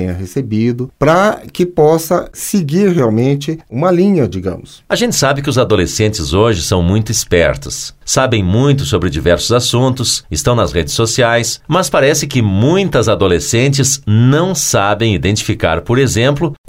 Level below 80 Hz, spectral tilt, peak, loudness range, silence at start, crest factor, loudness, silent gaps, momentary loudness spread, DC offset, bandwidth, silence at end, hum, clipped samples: -34 dBFS; -5 dB/octave; 0 dBFS; 2 LU; 0 s; 12 dB; -13 LUFS; none; 6 LU; under 0.1%; 16.5 kHz; 0.15 s; none; under 0.1%